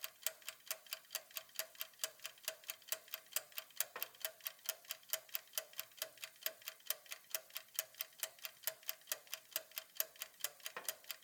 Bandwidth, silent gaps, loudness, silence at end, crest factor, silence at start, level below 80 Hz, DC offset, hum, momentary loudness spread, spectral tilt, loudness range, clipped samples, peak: over 20 kHz; none; -45 LUFS; 0 s; 34 dB; 0 s; under -90 dBFS; under 0.1%; none; 5 LU; 3 dB/octave; 1 LU; under 0.1%; -14 dBFS